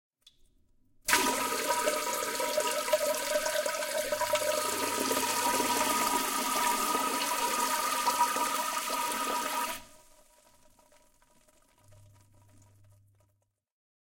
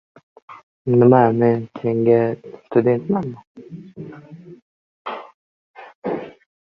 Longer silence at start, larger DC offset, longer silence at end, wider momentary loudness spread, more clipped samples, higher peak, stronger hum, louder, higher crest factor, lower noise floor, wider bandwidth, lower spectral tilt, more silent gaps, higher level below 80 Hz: first, 1.05 s vs 0.5 s; neither; first, 4.05 s vs 0.4 s; second, 4 LU vs 25 LU; neither; second, -8 dBFS vs -2 dBFS; neither; second, -29 LUFS vs -18 LUFS; about the same, 24 dB vs 20 dB; first, -75 dBFS vs -40 dBFS; first, 17 kHz vs 5.2 kHz; second, -0.5 dB/octave vs -11 dB/octave; second, none vs 0.63-0.85 s, 3.47-3.55 s, 4.62-5.05 s, 5.34-5.74 s, 5.95-6.02 s; about the same, -64 dBFS vs -60 dBFS